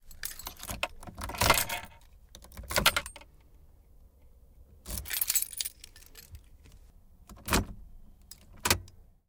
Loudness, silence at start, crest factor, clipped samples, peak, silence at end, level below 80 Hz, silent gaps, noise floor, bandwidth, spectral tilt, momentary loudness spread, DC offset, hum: -30 LUFS; 0.05 s; 24 dB; under 0.1%; -10 dBFS; 0.25 s; -48 dBFS; none; -57 dBFS; 19 kHz; -2 dB/octave; 25 LU; under 0.1%; none